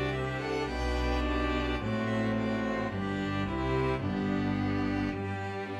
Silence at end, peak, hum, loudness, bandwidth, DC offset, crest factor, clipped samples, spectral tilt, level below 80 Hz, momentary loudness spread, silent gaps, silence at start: 0 s; -18 dBFS; none; -31 LUFS; 11.5 kHz; under 0.1%; 12 dB; under 0.1%; -7 dB/octave; -40 dBFS; 3 LU; none; 0 s